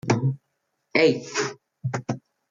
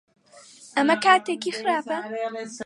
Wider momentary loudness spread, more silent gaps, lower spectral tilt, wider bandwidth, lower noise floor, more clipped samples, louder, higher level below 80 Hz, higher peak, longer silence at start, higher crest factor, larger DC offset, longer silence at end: about the same, 14 LU vs 12 LU; neither; first, -5.5 dB/octave vs -3 dB/octave; second, 7.6 kHz vs 11.5 kHz; first, -76 dBFS vs -50 dBFS; neither; about the same, -25 LUFS vs -23 LUFS; first, -64 dBFS vs -76 dBFS; second, -8 dBFS vs -4 dBFS; second, 0.05 s vs 0.35 s; about the same, 18 dB vs 20 dB; neither; first, 0.3 s vs 0 s